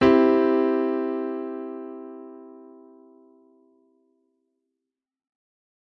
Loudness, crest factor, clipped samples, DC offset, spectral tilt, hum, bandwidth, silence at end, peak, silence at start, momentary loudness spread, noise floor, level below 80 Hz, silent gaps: -23 LUFS; 20 dB; under 0.1%; under 0.1%; -7.5 dB/octave; none; 6.2 kHz; 3.35 s; -6 dBFS; 0 s; 25 LU; -87 dBFS; -58 dBFS; none